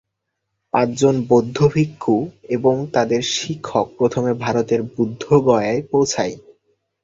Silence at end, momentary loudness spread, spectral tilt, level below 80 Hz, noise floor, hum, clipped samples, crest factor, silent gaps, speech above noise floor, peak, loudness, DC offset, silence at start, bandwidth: 0.65 s; 8 LU; -5.5 dB/octave; -52 dBFS; -77 dBFS; none; under 0.1%; 16 dB; none; 59 dB; -2 dBFS; -19 LUFS; under 0.1%; 0.75 s; 8 kHz